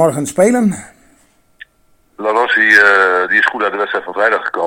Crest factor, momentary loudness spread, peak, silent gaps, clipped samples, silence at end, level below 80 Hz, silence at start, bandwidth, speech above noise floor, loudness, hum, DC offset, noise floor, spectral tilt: 14 dB; 11 LU; 0 dBFS; none; 0.2%; 0 s; -56 dBFS; 0 s; 17.5 kHz; 41 dB; -12 LUFS; none; under 0.1%; -54 dBFS; -4 dB/octave